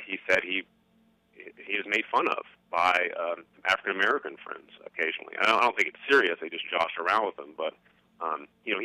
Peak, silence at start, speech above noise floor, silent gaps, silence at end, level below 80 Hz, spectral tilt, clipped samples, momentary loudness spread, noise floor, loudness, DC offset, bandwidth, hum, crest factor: -10 dBFS; 0 s; 37 dB; none; 0 s; -72 dBFS; -2.5 dB/octave; under 0.1%; 13 LU; -66 dBFS; -27 LUFS; under 0.1%; 14.5 kHz; 60 Hz at -75 dBFS; 18 dB